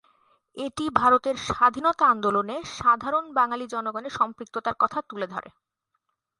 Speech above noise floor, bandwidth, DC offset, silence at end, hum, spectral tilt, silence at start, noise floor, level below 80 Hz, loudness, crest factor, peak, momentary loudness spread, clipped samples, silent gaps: 53 dB; 11.5 kHz; under 0.1%; 0.9 s; none; -4.5 dB/octave; 0.55 s; -77 dBFS; -58 dBFS; -24 LUFS; 24 dB; -2 dBFS; 12 LU; under 0.1%; none